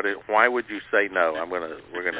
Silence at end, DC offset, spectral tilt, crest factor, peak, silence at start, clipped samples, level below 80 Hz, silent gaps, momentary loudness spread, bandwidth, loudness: 0 s; under 0.1%; -7 dB/octave; 22 dB; -2 dBFS; 0 s; under 0.1%; -64 dBFS; none; 10 LU; 4 kHz; -23 LUFS